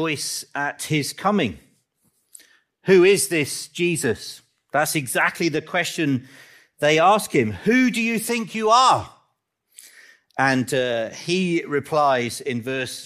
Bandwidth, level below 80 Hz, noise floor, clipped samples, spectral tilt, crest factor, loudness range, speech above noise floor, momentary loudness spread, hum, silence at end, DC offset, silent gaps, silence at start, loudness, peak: 15.5 kHz; -64 dBFS; -71 dBFS; under 0.1%; -4 dB/octave; 18 dB; 4 LU; 50 dB; 11 LU; none; 0 s; under 0.1%; none; 0 s; -21 LUFS; -4 dBFS